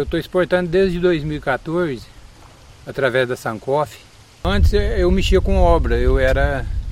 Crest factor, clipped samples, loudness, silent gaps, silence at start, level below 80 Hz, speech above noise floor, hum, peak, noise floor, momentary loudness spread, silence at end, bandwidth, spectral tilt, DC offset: 16 dB; under 0.1%; -19 LUFS; none; 0 s; -22 dBFS; 26 dB; none; -2 dBFS; -43 dBFS; 9 LU; 0 s; 15 kHz; -6.5 dB/octave; under 0.1%